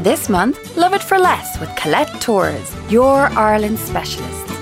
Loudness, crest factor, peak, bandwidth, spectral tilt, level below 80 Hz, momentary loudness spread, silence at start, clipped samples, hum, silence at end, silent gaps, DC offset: -16 LUFS; 14 dB; -2 dBFS; 16 kHz; -4.5 dB/octave; -38 dBFS; 11 LU; 0 s; under 0.1%; none; 0 s; none; under 0.1%